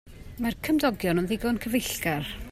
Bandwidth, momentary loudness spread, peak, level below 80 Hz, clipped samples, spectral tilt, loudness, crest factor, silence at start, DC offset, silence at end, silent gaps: 16 kHz; 7 LU; -12 dBFS; -46 dBFS; under 0.1%; -5 dB/octave; -27 LUFS; 16 dB; 0.05 s; under 0.1%; 0 s; none